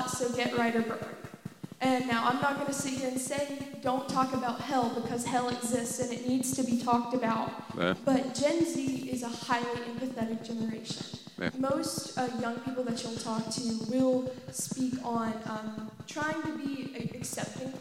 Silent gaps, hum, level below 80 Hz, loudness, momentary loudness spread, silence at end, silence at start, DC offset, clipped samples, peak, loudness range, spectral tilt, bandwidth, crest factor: none; none; -66 dBFS; -32 LUFS; 9 LU; 0 s; 0 s; under 0.1%; under 0.1%; -12 dBFS; 4 LU; -4 dB/octave; 16.5 kHz; 20 dB